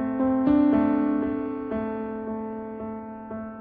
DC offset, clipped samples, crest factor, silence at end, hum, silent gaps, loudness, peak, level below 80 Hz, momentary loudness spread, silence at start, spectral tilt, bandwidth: under 0.1%; under 0.1%; 14 dB; 0 s; none; none; -25 LUFS; -10 dBFS; -52 dBFS; 16 LU; 0 s; -10.5 dB/octave; 4.2 kHz